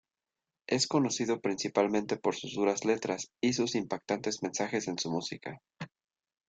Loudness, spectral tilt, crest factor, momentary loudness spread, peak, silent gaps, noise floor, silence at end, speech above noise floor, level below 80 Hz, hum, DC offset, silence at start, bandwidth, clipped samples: -32 LUFS; -4 dB/octave; 20 dB; 15 LU; -12 dBFS; none; under -90 dBFS; 0.6 s; over 58 dB; -72 dBFS; none; under 0.1%; 0.7 s; 9.4 kHz; under 0.1%